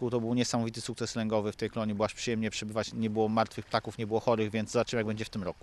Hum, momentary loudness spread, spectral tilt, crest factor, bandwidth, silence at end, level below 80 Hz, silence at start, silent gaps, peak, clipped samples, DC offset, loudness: none; 6 LU; -5 dB/octave; 20 dB; 12.5 kHz; 0.1 s; -60 dBFS; 0 s; none; -10 dBFS; under 0.1%; under 0.1%; -32 LUFS